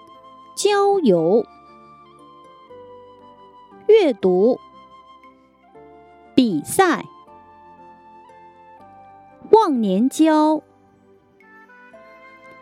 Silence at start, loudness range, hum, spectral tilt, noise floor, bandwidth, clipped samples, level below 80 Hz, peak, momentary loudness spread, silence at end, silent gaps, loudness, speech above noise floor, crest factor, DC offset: 0.55 s; 4 LU; none; -5 dB/octave; -54 dBFS; 15.5 kHz; under 0.1%; -66 dBFS; 0 dBFS; 11 LU; 2 s; none; -17 LUFS; 37 dB; 22 dB; under 0.1%